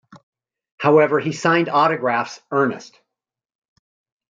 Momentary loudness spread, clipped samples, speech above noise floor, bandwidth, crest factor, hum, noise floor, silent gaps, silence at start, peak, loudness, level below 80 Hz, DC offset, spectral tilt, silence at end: 8 LU; under 0.1%; 67 dB; 7.8 kHz; 18 dB; none; -85 dBFS; 0.23-0.32 s, 0.72-0.78 s; 0.15 s; -2 dBFS; -18 LUFS; -70 dBFS; under 0.1%; -6 dB/octave; 1.45 s